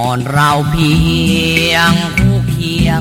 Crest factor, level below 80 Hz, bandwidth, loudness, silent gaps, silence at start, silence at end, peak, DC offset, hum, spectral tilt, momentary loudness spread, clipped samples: 12 dB; -26 dBFS; 16.5 kHz; -12 LUFS; none; 0 s; 0 s; 0 dBFS; under 0.1%; none; -5 dB/octave; 4 LU; 0.1%